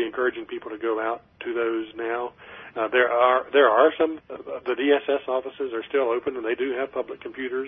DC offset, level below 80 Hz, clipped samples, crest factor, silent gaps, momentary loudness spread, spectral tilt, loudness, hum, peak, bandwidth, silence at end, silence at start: under 0.1%; -66 dBFS; under 0.1%; 20 dB; none; 15 LU; -7 dB/octave; -24 LUFS; none; -4 dBFS; 3.8 kHz; 0 s; 0 s